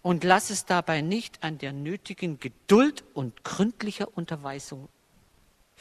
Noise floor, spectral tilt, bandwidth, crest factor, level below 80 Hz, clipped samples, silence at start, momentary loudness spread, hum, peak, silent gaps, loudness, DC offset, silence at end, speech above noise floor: -63 dBFS; -5 dB/octave; 13.5 kHz; 24 dB; -64 dBFS; under 0.1%; 0.05 s; 15 LU; none; -4 dBFS; none; -27 LUFS; under 0.1%; 0.95 s; 36 dB